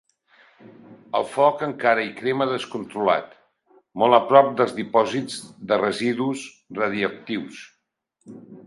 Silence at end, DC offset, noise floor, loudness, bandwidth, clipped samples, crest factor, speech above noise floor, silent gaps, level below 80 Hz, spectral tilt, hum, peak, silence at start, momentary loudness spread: 0.05 s; under 0.1%; -73 dBFS; -22 LUFS; 11.5 kHz; under 0.1%; 22 dB; 51 dB; none; -68 dBFS; -5 dB/octave; none; 0 dBFS; 0.65 s; 16 LU